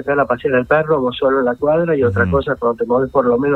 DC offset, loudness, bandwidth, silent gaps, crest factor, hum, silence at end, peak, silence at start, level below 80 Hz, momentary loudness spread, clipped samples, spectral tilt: under 0.1%; -16 LUFS; 4.3 kHz; none; 14 dB; none; 0 s; -2 dBFS; 0 s; -40 dBFS; 3 LU; under 0.1%; -9 dB/octave